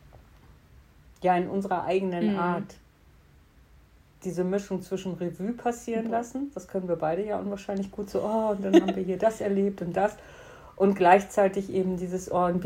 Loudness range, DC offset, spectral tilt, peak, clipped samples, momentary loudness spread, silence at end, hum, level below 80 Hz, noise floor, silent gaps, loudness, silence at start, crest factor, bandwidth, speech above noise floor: 8 LU; under 0.1%; -6.5 dB/octave; -6 dBFS; under 0.1%; 12 LU; 0 s; none; -58 dBFS; -57 dBFS; none; -27 LUFS; 0.15 s; 22 dB; 16 kHz; 31 dB